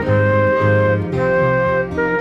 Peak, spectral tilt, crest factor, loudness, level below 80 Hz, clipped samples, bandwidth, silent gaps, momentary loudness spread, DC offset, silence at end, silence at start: -4 dBFS; -9 dB/octave; 12 dB; -16 LUFS; -40 dBFS; under 0.1%; 6.2 kHz; none; 3 LU; under 0.1%; 0 s; 0 s